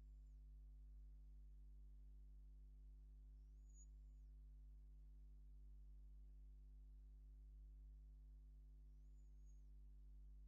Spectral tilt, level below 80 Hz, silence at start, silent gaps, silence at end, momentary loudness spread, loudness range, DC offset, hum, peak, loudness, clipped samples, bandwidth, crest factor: -9.5 dB/octave; -62 dBFS; 0 s; none; 0 s; 1 LU; 0 LU; under 0.1%; 50 Hz at -60 dBFS; -56 dBFS; -66 LUFS; under 0.1%; 7 kHz; 6 dB